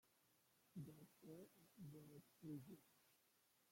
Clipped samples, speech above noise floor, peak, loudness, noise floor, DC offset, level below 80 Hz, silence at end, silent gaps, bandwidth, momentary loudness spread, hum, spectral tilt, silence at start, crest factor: under 0.1%; 21 dB; -44 dBFS; -62 LUFS; -81 dBFS; under 0.1%; under -90 dBFS; 0 s; none; 16.5 kHz; 8 LU; none; -7 dB/octave; 0.05 s; 18 dB